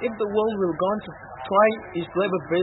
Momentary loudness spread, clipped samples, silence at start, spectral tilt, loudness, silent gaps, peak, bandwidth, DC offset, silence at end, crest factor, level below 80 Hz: 11 LU; under 0.1%; 0 s; -10.5 dB/octave; -23 LUFS; none; -6 dBFS; 4.1 kHz; under 0.1%; 0 s; 16 dB; -58 dBFS